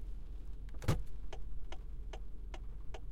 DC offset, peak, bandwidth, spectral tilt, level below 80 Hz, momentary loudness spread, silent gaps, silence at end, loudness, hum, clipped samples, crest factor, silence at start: under 0.1%; -20 dBFS; 15.5 kHz; -6 dB/octave; -44 dBFS; 12 LU; none; 0 s; -46 LUFS; none; under 0.1%; 20 dB; 0 s